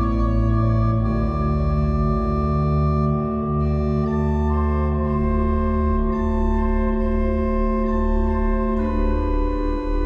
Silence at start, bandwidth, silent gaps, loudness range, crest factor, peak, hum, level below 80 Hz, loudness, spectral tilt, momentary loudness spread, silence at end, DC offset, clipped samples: 0 s; 5.6 kHz; none; 1 LU; 10 dB; -8 dBFS; none; -24 dBFS; -21 LUFS; -10.5 dB/octave; 3 LU; 0 s; under 0.1%; under 0.1%